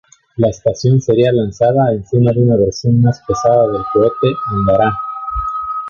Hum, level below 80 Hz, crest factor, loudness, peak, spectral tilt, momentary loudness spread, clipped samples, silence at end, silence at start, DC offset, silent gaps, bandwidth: none; -36 dBFS; 12 dB; -14 LUFS; 0 dBFS; -7.5 dB/octave; 8 LU; under 0.1%; 0 s; 0.4 s; under 0.1%; none; 7.2 kHz